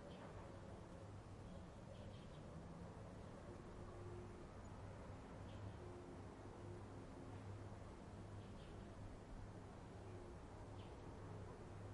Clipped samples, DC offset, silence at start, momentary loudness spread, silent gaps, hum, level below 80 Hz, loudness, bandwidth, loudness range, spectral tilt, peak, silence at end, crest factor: under 0.1%; under 0.1%; 0 s; 2 LU; none; none; -64 dBFS; -57 LUFS; 11 kHz; 1 LU; -7 dB/octave; -42 dBFS; 0 s; 14 dB